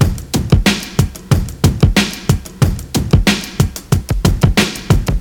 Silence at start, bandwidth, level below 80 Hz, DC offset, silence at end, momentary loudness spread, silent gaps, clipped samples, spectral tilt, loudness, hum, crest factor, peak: 0 s; 19.5 kHz; -22 dBFS; under 0.1%; 0 s; 5 LU; none; under 0.1%; -5 dB/octave; -15 LUFS; none; 14 dB; 0 dBFS